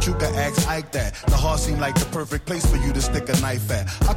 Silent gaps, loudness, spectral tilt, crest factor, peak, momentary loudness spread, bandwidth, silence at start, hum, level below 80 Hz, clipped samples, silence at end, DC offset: none; -23 LUFS; -4.5 dB/octave; 14 dB; -8 dBFS; 4 LU; 16.5 kHz; 0 s; none; -26 dBFS; under 0.1%; 0 s; under 0.1%